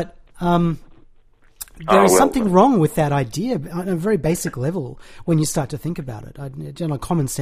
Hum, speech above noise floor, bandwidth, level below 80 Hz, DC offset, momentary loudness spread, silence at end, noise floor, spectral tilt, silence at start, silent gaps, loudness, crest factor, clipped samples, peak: none; 32 dB; 15.5 kHz; -42 dBFS; under 0.1%; 18 LU; 0 s; -51 dBFS; -6 dB/octave; 0 s; none; -19 LUFS; 20 dB; under 0.1%; 0 dBFS